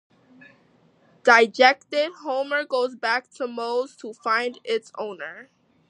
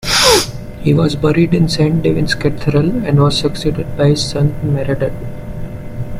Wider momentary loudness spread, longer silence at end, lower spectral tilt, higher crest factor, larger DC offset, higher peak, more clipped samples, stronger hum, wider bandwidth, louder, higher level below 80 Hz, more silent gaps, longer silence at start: about the same, 16 LU vs 15 LU; first, 0.45 s vs 0 s; second, -2 dB/octave vs -5 dB/octave; first, 24 dB vs 14 dB; neither; about the same, 0 dBFS vs 0 dBFS; neither; neither; second, 11 kHz vs 16 kHz; second, -22 LUFS vs -14 LUFS; second, -82 dBFS vs -30 dBFS; neither; first, 1.25 s vs 0 s